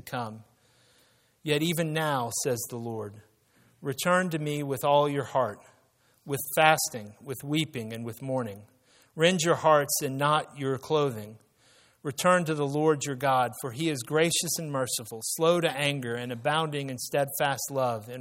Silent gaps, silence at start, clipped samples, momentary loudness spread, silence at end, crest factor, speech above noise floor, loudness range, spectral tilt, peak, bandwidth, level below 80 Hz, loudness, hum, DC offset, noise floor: none; 0.05 s; under 0.1%; 13 LU; 0 s; 24 dB; 38 dB; 3 LU; -4 dB/octave; -4 dBFS; 16.5 kHz; -70 dBFS; -27 LUFS; none; under 0.1%; -66 dBFS